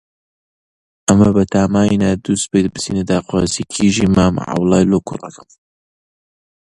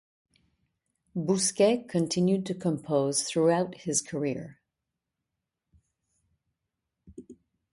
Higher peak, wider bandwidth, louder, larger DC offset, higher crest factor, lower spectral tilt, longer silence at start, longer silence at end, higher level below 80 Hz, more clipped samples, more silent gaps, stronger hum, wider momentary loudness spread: first, 0 dBFS vs -12 dBFS; about the same, 11.5 kHz vs 11.5 kHz; first, -15 LUFS vs -27 LUFS; neither; about the same, 16 dB vs 20 dB; about the same, -5.5 dB/octave vs -4.5 dB/octave; about the same, 1.1 s vs 1.15 s; first, 1.35 s vs 0.4 s; first, -38 dBFS vs -68 dBFS; neither; neither; neither; second, 7 LU vs 10 LU